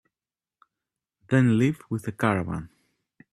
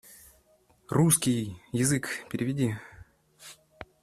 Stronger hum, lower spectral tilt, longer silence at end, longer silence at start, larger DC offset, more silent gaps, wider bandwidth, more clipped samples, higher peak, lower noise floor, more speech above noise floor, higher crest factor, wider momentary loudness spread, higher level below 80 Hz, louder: neither; first, -7.5 dB/octave vs -4.5 dB/octave; first, 0.65 s vs 0.2 s; first, 1.3 s vs 0.1 s; neither; neither; second, 13 kHz vs 15.5 kHz; neither; about the same, -6 dBFS vs -8 dBFS; first, under -90 dBFS vs -64 dBFS; first, over 66 dB vs 37 dB; about the same, 22 dB vs 22 dB; second, 12 LU vs 26 LU; about the same, -58 dBFS vs -60 dBFS; about the same, -25 LUFS vs -27 LUFS